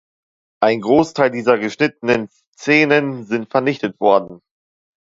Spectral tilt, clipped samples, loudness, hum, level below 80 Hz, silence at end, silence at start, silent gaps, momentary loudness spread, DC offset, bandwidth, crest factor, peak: -6 dB/octave; under 0.1%; -17 LUFS; none; -58 dBFS; 0.65 s; 0.6 s; 2.47-2.53 s; 8 LU; under 0.1%; 7.8 kHz; 18 dB; 0 dBFS